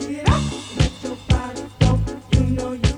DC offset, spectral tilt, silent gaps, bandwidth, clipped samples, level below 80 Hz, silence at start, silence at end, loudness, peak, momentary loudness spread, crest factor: under 0.1%; -6 dB/octave; none; 11.5 kHz; under 0.1%; -26 dBFS; 0 s; 0 s; -21 LUFS; -4 dBFS; 6 LU; 16 dB